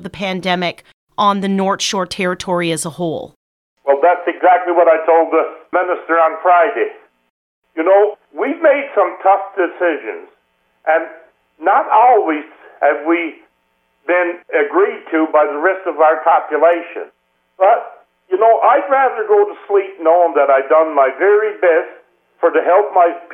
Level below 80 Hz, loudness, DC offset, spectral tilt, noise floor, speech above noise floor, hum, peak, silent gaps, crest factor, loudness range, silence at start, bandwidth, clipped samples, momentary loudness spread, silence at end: -64 dBFS; -14 LUFS; under 0.1%; -4.5 dB/octave; -63 dBFS; 49 dB; none; 0 dBFS; 0.93-1.07 s, 3.36-3.77 s, 7.30-7.62 s; 14 dB; 4 LU; 0 s; 13 kHz; under 0.1%; 11 LU; 0 s